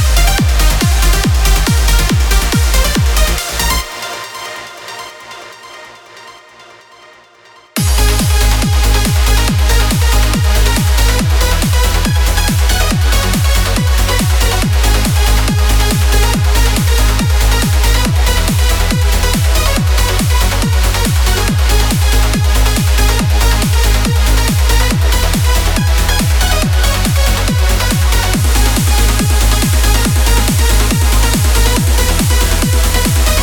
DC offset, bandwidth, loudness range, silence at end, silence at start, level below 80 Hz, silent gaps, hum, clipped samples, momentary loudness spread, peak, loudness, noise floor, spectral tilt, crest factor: under 0.1%; 19.5 kHz; 5 LU; 0 s; 0 s; -12 dBFS; none; none; under 0.1%; 1 LU; 0 dBFS; -12 LUFS; -42 dBFS; -4 dB/octave; 10 dB